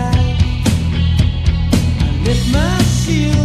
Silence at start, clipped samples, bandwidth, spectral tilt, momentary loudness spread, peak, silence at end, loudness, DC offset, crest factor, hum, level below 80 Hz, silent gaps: 0 s; under 0.1%; 14.5 kHz; -6 dB/octave; 2 LU; 0 dBFS; 0 s; -15 LUFS; under 0.1%; 12 dB; none; -20 dBFS; none